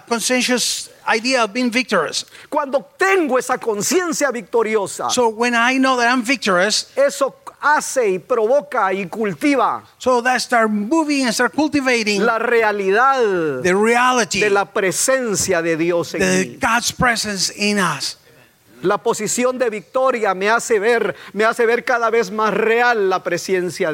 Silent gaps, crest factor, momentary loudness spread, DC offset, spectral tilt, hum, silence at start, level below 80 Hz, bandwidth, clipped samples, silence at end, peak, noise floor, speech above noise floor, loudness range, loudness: none; 16 dB; 6 LU; under 0.1%; -3 dB/octave; none; 0.1 s; -54 dBFS; 16.5 kHz; under 0.1%; 0 s; -2 dBFS; -50 dBFS; 33 dB; 3 LU; -17 LUFS